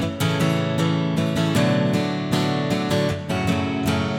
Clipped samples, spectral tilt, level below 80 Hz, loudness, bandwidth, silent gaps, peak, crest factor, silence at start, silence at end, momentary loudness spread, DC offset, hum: under 0.1%; -6 dB/octave; -48 dBFS; -22 LUFS; 17 kHz; none; -6 dBFS; 14 dB; 0 s; 0 s; 3 LU; under 0.1%; none